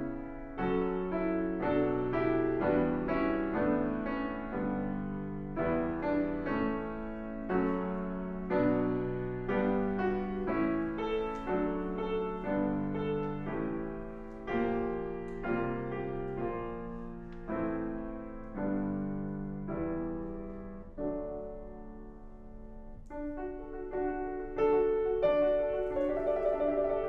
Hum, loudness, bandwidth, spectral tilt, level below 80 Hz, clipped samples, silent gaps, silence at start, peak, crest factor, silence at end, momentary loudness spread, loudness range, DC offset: none; -34 LUFS; 6 kHz; -9.5 dB/octave; -48 dBFS; under 0.1%; none; 0 s; -16 dBFS; 16 dB; 0 s; 13 LU; 8 LU; under 0.1%